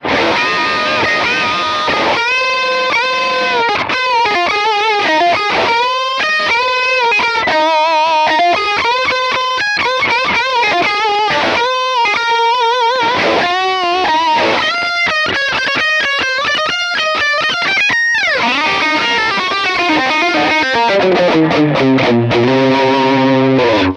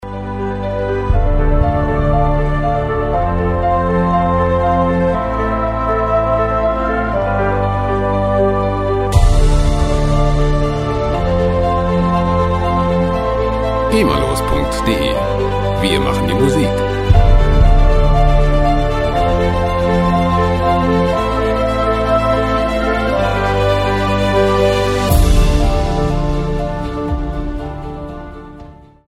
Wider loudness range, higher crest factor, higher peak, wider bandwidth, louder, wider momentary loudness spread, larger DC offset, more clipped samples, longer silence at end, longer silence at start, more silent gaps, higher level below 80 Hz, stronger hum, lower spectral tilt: about the same, 1 LU vs 2 LU; about the same, 12 dB vs 14 dB; about the same, 0 dBFS vs 0 dBFS; second, 11.5 kHz vs 15 kHz; first, -12 LUFS vs -15 LUFS; second, 2 LU vs 5 LU; neither; neither; second, 0 s vs 0.35 s; about the same, 0 s vs 0 s; neither; second, -48 dBFS vs -18 dBFS; neither; second, -4 dB/octave vs -6.5 dB/octave